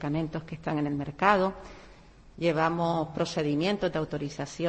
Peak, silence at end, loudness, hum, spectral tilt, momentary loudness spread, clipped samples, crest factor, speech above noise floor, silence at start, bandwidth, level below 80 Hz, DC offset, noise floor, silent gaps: -8 dBFS; 0 s; -29 LUFS; none; -6 dB/octave; 11 LU; under 0.1%; 20 dB; 24 dB; 0 s; 8.8 kHz; -54 dBFS; under 0.1%; -52 dBFS; none